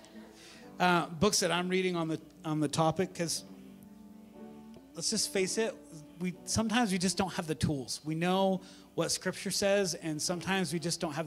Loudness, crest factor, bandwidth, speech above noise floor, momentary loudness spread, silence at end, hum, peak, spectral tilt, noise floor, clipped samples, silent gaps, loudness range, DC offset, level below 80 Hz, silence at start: -32 LUFS; 22 dB; 16 kHz; 21 dB; 22 LU; 0 s; none; -12 dBFS; -4 dB/octave; -52 dBFS; under 0.1%; none; 4 LU; under 0.1%; -62 dBFS; 0 s